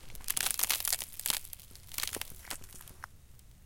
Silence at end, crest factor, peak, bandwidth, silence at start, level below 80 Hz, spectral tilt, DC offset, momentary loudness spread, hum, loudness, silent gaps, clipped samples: 0 s; 32 dB; -6 dBFS; 17 kHz; 0 s; -54 dBFS; 0.5 dB/octave; under 0.1%; 20 LU; none; -33 LUFS; none; under 0.1%